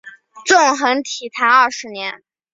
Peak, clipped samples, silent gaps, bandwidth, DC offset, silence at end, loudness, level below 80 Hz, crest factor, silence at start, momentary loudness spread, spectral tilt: 0 dBFS; under 0.1%; none; 8 kHz; under 0.1%; 0.4 s; -15 LUFS; -68 dBFS; 16 dB; 0.05 s; 14 LU; -0.5 dB/octave